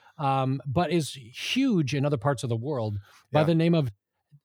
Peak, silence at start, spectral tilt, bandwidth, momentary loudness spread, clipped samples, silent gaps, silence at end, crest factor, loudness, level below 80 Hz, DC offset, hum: -10 dBFS; 0.2 s; -6.5 dB/octave; 16 kHz; 11 LU; under 0.1%; none; 0.5 s; 18 dB; -27 LUFS; -62 dBFS; under 0.1%; none